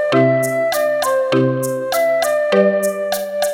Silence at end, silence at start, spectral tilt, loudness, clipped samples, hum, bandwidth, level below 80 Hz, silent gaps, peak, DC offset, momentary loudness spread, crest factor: 0 s; 0 s; -5 dB/octave; -16 LUFS; under 0.1%; none; 18 kHz; -60 dBFS; none; 0 dBFS; under 0.1%; 5 LU; 16 dB